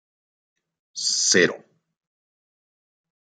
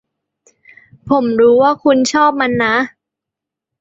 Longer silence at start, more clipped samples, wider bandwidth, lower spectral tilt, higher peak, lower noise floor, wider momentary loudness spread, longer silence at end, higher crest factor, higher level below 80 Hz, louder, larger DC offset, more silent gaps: about the same, 0.95 s vs 1.05 s; neither; first, 11.5 kHz vs 8.2 kHz; second, -1.5 dB/octave vs -4.5 dB/octave; about the same, -4 dBFS vs -2 dBFS; first, under -90 dBFS vs -83 dBFS; first, 21 LU vs 7 LU; first, 1.75 s vs 0.9 s; first, 24 dB vs 14 dB; second, -76 dBFS vs -54 dBFS; second, -20 LUFS vs -13 LUFS; neither; neither